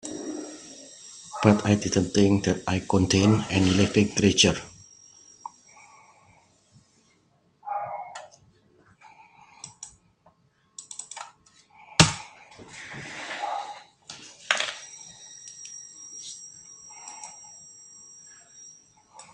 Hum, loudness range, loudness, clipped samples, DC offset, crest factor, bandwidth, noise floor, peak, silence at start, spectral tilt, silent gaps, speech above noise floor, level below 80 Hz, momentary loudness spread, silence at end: none; 20 LU; -24 LUFS; under 0.1%; under 0.1%; 28 dB; 11 kHz; -65 dBFS; 0 dBFS; 0.05 s; -4.5 dB/octave; none; 44 dB; -58 dBFS; 25 LU; 0.1 s